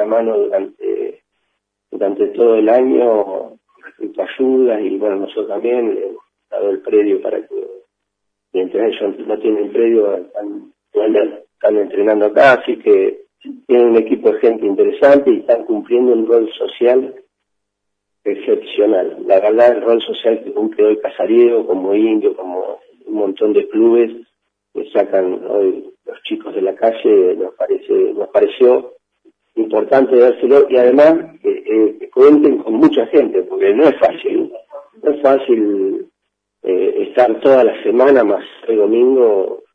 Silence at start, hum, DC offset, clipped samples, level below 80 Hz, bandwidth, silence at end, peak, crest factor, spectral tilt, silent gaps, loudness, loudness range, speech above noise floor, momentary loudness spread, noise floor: 0 s; none; under 0.1%; under 0.1%; -66 dBFS; 5.6 kHz; 0.15 s; 0 dBFS; 14 dB; -7 dB/octave; none; -14 LUFS; 6 LU; 62 dB; 13 LU; -75 dBFS